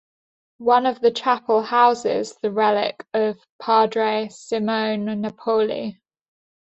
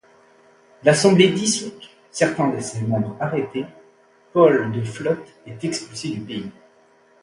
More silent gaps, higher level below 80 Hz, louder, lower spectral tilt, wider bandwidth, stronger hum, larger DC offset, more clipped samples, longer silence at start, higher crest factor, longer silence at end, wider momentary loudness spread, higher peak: first, 3.50-3.59 s vs none; second, -68 dBFS vs -60 dBFS; about the same, -21 LUFS vs -20 LUFS; about the same, -5 dB/octave vs -5 dB/octave; second, 8.2 kHz vs 11.5 kHz; neither; neither; neither; second, 0.6 s vs 0.85 s; about the same, 18 dB vs 20 dB; about the same, 0.75 s vs 0.7 s; second, 9 LU vs 16 LU; second, -4 dBFS vs 0 dBFS